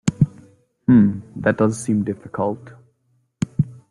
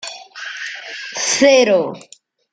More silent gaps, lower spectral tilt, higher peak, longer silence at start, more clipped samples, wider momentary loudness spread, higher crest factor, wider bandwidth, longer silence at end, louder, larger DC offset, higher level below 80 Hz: neither; first, -7.5 dB/octave vs -2 dB/octave; about the same, -2 dBFS vs 0 dBFS; about the same, 0.05 s vs 0 s; neither; second, 12 LU vs 19 LU; about the same, 18 dB vs 18 dB; first, 11.5 kHz vs 9.4 kHz; second, 0.15 s vs 0.5 s; second, -20 LUFS vs -16 LUFS; neither; first, -50 dBFS vs -68 dBFS